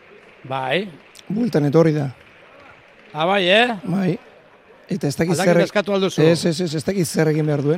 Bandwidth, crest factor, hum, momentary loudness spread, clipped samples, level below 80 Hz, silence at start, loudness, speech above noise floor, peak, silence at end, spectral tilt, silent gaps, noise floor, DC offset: 16 kHz; 18 dB; none; 12 LU; under 0.1%; -60 dBFS; 0.45 s; -19 LUFS; 30 dB; -2 dBFS; 0 s; -5.5 dB/octave; none; -48 dBFS; under 0.1%